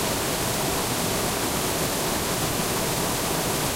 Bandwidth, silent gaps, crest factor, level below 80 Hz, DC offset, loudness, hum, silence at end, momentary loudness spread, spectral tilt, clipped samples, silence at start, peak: 16 kHz; none; 14 dB; -42 dBFS; under 0.1%; -24 LUFS; none; 0 s; 0 LU; -3 dB/octave; under 0.1%; 0 s; -12 dBFS